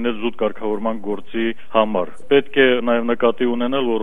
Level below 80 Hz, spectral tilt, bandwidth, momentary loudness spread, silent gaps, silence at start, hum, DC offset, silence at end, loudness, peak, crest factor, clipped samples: -56 dBFS; -7 dB/octave; 3.8 kHz; 8 LU; none; 0 s; none; 5%; 0 s; -19 LUFS; -2 dBFS; 18 dB; under 0.1%